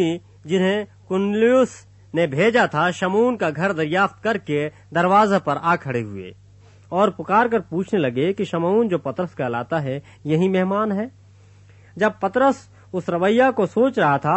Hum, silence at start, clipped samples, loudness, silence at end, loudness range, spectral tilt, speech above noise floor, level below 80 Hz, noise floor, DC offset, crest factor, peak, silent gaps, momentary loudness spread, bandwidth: none; 0 s; under 0.1%; -20 LUFS; 0 s; 3 LU; -6.5 dB/octave; 29 dB; -60 dBFS; -48 dBFS; under 0.1%; 16 dB; -4 dBFS; none; 10 LU; 8.4 kHz